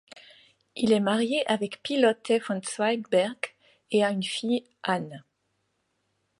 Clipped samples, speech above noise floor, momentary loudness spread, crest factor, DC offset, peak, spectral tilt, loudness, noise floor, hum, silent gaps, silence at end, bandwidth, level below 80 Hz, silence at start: under 0.1%; 50 dB; 8 LU; 18 dB; under 0.1%; -10 dBFS; -4.5 dB/octave; -27 LUFS; -76 dBFS; none; none; 1.2 s; 11.5 kHz; -76 dBFS; 0.15 s